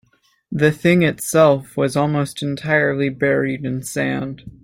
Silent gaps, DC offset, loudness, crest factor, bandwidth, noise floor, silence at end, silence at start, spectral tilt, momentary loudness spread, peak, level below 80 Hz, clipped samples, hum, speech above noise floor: none; under 0.1%; -18 LUFS; 16 dB; 16.5 kHz; -58 dBFS; 0.15 s; 0.5 s; -6 dB/octave; 10 LU; -2 dBFS; -54 dBFS; under 0.1%; none; 40 dB